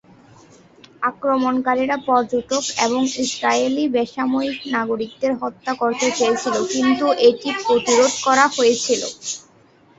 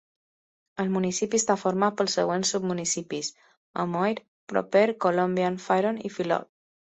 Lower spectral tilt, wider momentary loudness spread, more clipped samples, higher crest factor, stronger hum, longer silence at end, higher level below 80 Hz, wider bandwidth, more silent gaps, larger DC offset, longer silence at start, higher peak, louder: second, -2.5 dB/octave vs -4 dB/octave; about the same, 8 LU vs 9 LU; neither; about the same, 20 dB vs 18 dB; neither; first, 0.6 s vs 0.4 s; first, -60 dBFS vs -68 dBFS; about the same, 8.2 kHz vs 8.4 kHz; second, none vs 3.57-3.74 s, 4.28-4.47 s; neither; first, 1 s vs 0.75 s; first, 0 dBFS vs -8 dBFS; first, -19 LUFS vs -26 LUFS